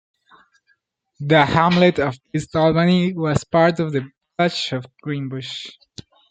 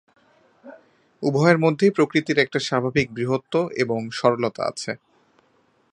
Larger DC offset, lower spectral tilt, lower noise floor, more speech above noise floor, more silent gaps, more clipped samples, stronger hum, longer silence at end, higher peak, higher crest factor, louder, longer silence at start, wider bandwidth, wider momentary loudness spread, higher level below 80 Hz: neither; about the same, -6.5 dB/octave vs -6 dB/octave; about the same, -66 dBFS vs -63 dBFS; first, 47 dB vs 42 dB; neither; neither; neither; second, 0.6 s vs 0.95 s; about the same, 0 dBFS vs -2 dBFS; about the same, 20 dB vs 22 dB; first, -19 LUFS vs -22 LUFS; first, 1.2 s vs 0.65 s; second, 9 kHz vs 10.5 kHz; first, 14 LU vs 10 LU; first, -50 dBFS vs -60 dBFS